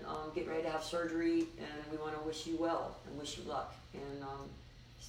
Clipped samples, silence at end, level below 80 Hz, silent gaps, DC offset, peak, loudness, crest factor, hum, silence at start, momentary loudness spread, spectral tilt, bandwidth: under 0.1%; 0 s; -60 dBFS; none; under 0.1%; -26 dBFS; -40 LUFS; 14 dB; none; 0 s; 13 LU; -5 dB/octave; 15.5 kHz